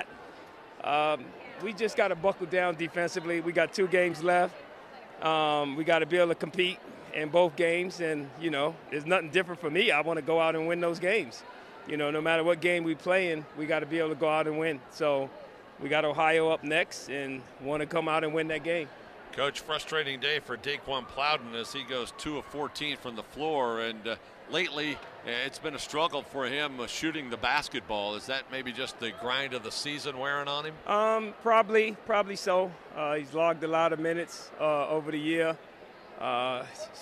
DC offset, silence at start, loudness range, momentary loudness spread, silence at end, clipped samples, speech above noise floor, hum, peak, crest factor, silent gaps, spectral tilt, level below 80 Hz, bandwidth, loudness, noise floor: under 0.1%; 0 s; 4 LU; 11 LU; 0 s; under 0.1%; 20 dB; none; -10 dBFS; 20 dB; none; -4 dB/octave; -66 dBFS; 14 kHz; -30 LUFS; -50 dBFS